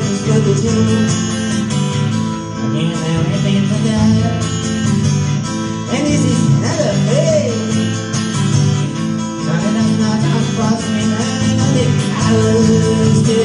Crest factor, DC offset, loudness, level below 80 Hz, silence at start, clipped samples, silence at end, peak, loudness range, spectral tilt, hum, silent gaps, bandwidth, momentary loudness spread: 12 dB; under 0.1%; -15 LUFS; -36 dBFS; 0 s; under 0.1%; 0 s; -2 dBFS; 2 LU; -6 dB/octave; none; none; 11.5 kHz; 6 LU